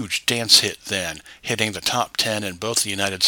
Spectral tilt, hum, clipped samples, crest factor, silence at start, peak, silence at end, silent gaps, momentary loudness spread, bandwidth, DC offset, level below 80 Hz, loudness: -1.5 dB/octave; none; under 0.1%; 22 dB; 0 s; 0 dBFS; 0 s; none; 12 LU; 19 kHz; under 0.1%; -56 dBFS; -20 LUFS